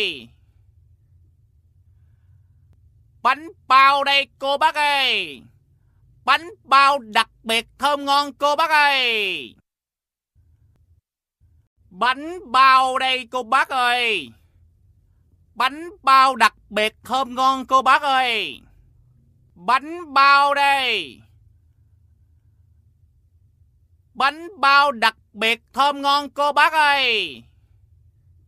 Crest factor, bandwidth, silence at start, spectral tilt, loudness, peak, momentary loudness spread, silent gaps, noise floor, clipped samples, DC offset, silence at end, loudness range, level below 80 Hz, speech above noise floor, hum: 20 dB; 15 kHz; 0 s; -1.5 dB/octave; -18 LUFS; -2 dBFS; 10 LU; 11.67-11.76 s; -90 dBFS; under 0.1%; under 0.1%; 1.05 s; 6 LU; -60 dBFS; 71 dB; none